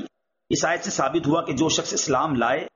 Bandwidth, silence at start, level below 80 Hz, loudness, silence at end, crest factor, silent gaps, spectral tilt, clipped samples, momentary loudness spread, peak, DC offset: 7.4 kHz; 0 s; -56 dBFS; -23 LUFS; 0.05 s; 14 dB; none; -3.5 dB/octave; under 0.1%; 3 LU; -10 dBFS; under 0.1%